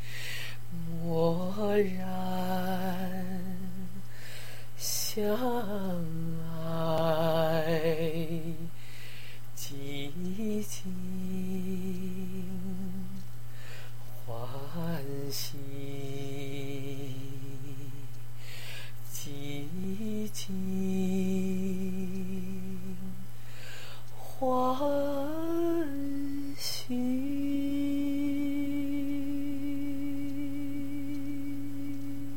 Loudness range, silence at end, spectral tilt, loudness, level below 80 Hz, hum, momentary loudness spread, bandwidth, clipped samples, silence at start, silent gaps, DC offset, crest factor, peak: 8 LU; 0 s; -5.5 dB/octave; -34 LUFS; -60 dBFS; none; 15 LU; 16.5 kHz; under 0.1%; 0 s; none; 3%; 20 dB; -14 dBFS